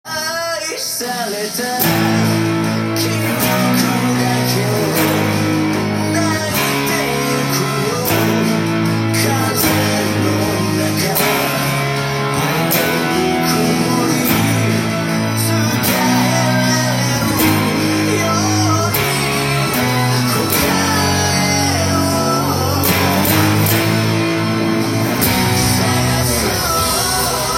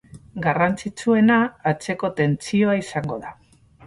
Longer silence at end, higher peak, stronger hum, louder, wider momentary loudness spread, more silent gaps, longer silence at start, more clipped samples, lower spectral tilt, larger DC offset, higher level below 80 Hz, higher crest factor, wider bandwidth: second, 0 s vs 0.55 s; first, 0 dBFS vs -6 dBFS; neither; first, -15 LUFS vs -21 LUFS; second, 3 LU vs 13 LU; neither; about the same, 0.05 s vs 0.15 s; neither; second, -4 dB/octave vs -6.5 dB/octave; neither; first, -42 dBFS vs -54 dBFS; about the same, 16 dB vs 16 dB; first, 17 kHz vs 11.5 kHz